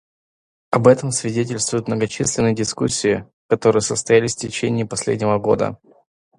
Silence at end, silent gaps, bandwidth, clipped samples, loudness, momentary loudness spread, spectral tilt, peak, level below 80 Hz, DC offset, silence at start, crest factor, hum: 0.65 s; 3.33-3.49 s; 11.5 kHz; under 0.1%; -19 LUFS; 7 LU; -4.5 dB/octave; 0 dBFS; -50 dBFS; under 0.1%; 0.7 s; 20 dB; none